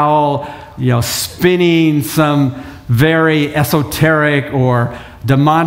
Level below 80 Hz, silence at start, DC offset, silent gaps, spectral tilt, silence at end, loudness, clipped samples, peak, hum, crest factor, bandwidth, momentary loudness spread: -40 dBFS; 0 s; under 0.1%; none; -6 dB/octave; 0 s; -13 LUFS; under 0.1%; 0 dBFS; none; 12 dB; 16.5 kHz; 9 LU